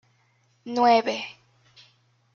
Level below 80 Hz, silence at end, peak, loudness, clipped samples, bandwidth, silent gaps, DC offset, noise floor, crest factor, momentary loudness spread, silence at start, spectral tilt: -76 dBFS; 1.05 s; -8 dBFS; -23 LUFS; under 0.1%; 7.2 kHz; none; under 0.1%; -65 dBFS; 20 dB; 20 LU; 0.65 s; -4 dB/octave